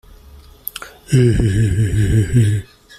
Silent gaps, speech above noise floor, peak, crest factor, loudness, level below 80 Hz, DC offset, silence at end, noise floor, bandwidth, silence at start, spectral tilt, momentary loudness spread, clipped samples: none; 28 dB; 0 dBFS; 16 dB; -16 LUFS; -30 dBFS; under 0.1%; 0.35 s; -42 dBFS; 15 kHz; 0.75 s; -7 dB/octave; 15 LU; under 0.1%